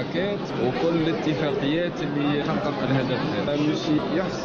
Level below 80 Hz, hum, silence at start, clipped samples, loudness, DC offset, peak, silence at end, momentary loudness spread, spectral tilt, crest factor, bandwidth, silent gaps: -50 dBFS; none; 0 s; under 0.1%; -24 LUFS; under 0.1%; -10 dBFS; 0 s; 3 LU; -6.5 dB/octave; 14 dB; 7.2 kHz; none